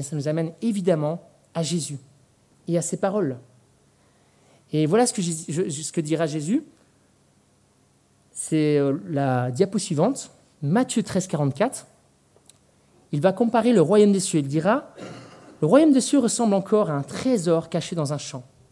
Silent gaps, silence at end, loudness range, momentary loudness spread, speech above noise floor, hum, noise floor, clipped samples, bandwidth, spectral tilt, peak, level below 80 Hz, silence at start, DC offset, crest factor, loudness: none; 0.3 s; 8 LU; 15 LU; 39 dB; none; -61 dBFS; under 0.1%; 12 kHz; -5.5 dB/octave; -4 dBFS; -70 dBFS; 0 s; under 0.1%; 20 dB; -23 LUFS